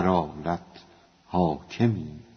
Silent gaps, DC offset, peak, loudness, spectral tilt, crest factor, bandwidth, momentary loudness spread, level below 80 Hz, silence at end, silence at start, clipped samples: none; under 0.1%; -8 dBFS; -28 LUFS; -7 dB/octave; 20 dB; 6.6 kHz; 7 LU; -52 dBFS; 0.15 s; 0 s; under 0.1%